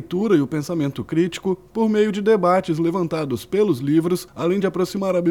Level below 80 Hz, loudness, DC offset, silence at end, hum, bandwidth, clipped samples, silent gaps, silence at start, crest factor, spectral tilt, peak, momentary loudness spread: -56 dBFS; -21 LUFS; under 0.1%; 0 s; none; 18 kHz; under 0.1%; none; 0 s; 14 dB; -7 dB/octave; -6 dBFS; 6 LU